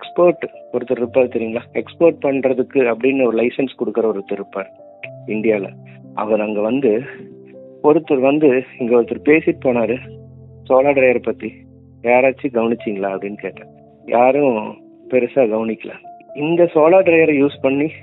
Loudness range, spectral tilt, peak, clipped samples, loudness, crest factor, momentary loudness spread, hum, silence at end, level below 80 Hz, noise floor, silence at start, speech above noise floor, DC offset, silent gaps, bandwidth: 5 LU; -11 dB/octave; 0 dBFS; under 0.1%; -17 LUFS; 16 dB; 16 LU; none; 0 s; -62 dBFS; -39 dBFS; 0 s; 23 dB; under 0.1%; none; 4.1 kHz